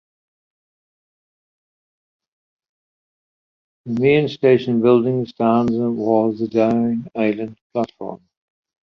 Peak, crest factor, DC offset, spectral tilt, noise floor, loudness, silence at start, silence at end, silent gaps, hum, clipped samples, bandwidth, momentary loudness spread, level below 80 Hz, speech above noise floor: -2 dBFS; 18 dB; under 0.1%; -8.5 dB/octave; under -90 dBFS; -18 LUFS; 3.85 s; 0.75 s; 7.61-7.70 s; none; under 0.1%; 6.4 kHz; 12 LU; -60 dBFS; over 72 dB